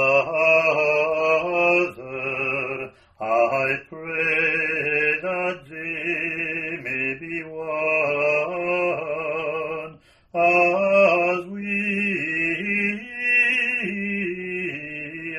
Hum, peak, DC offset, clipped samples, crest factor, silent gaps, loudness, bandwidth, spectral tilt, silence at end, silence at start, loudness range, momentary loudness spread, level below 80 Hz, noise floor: none; -6 dBFS; under 0.1%; under 0.1%; 16 dB; none; -22 LUFS; 10.5 kHz; -6 dB/octave; 0 s; 0 s; 4 LU; 12 LU; -62 dBFS; -43 dBFS